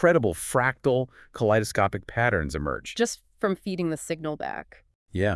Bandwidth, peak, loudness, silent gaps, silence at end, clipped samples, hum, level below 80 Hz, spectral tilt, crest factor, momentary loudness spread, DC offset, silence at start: 12 kHz; -8 dBFS; -27 LUFS; 4.95-5.06 s; 0 s; under 0.1%; none; -48 dBFS; -5.5 dB/octave; 18 dB; 9 LU; under 0.1%; 0 s